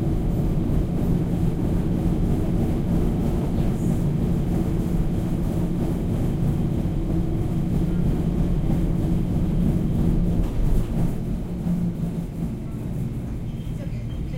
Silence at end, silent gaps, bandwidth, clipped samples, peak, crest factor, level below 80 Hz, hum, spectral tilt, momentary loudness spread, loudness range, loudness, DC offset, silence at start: 0 s; none; 16 kHz; under 0.1%; -8 dBFS; 14 dB; -28 dBFS; none; -9 dB/octave; 7 LU; 3 LU; -24 LUFS; under 0.1%; 0 s